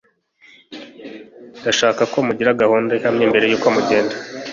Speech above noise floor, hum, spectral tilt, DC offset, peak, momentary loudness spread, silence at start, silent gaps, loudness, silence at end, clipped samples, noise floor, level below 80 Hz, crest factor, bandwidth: 36 dB; none; -4 dB/octave; under 0.1%; -2 dBFS; 22 LU; 0.7 s; none; -17 LUFS; 0 s; under 0.1%; -52 dBFS; -58 dBFS; 18 dB; 7.6 kHz